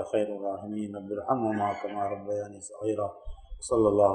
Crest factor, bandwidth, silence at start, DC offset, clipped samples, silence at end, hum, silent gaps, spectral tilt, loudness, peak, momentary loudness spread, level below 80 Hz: 20 dB; 10.5 kHz; 0 s; under 0.1%; under 0.1%; 0 s; none; none; -6.5 dB/octave; -30 LUFS; -8 dBFS; 12 LU; -50 dBFS